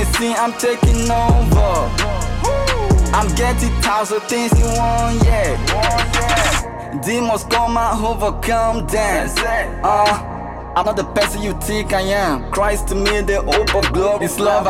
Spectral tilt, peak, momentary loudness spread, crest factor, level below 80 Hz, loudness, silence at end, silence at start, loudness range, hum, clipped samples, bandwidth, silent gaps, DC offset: -4.5 dB/octave; -4 dBFS; 5 LU; 12 dB; -22 dBFS; -17 LUFS; 0 s; 0 s; 2 LU; none; under 0.1%; 16 kHz; none; under 0.1%